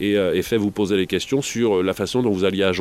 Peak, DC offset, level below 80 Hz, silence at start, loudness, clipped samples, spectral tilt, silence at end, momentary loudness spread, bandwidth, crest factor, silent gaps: -4 dBFS; under 0.1%; -52 dBFS; 0 s; -21 LUFS; under 0.1%; -5 dB/octave; 0 s; 2 LU; 15.5 kHz; 16 dB; none